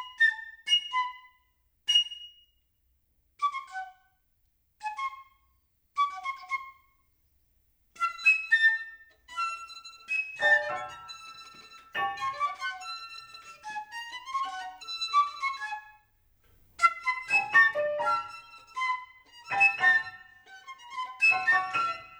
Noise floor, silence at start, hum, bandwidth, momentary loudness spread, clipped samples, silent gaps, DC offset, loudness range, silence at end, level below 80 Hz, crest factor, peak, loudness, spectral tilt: -72 dBFS; 0 s; none; over 20 kHz; 21 LU; under 0.1%; none; under 0.1%; 11 LU; 0 s; -72 dBFS; 22 dB; -8 dBFS; -27 LUFS; 0.5 dB/octave